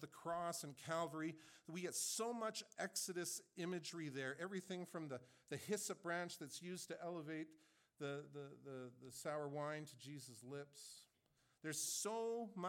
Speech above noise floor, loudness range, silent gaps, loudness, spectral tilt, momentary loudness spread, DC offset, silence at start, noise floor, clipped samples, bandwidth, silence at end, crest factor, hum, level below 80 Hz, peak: 33 dB; 6 LU; none; -47 LUFS; -3.5 dB/octave; 12 LU; under 0.1%; 0 s; -81 dBFS; under 0.1%; 17.5 kHz; 0 s; 18 dB; none; under -90 dBFS; -30 dBFS